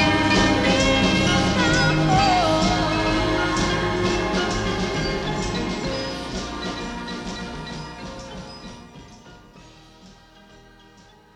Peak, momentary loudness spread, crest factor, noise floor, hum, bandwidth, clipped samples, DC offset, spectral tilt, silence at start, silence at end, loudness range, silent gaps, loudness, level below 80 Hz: -6 dBFS; 17 LU; 18 dB; -50 dBFS; none; 13 kHz; under 0.1%; under 0.1%; -4.5 dB/octave; 0 s; 1.25 s; 19 LU; none; -21 LUFS; -36 dBFS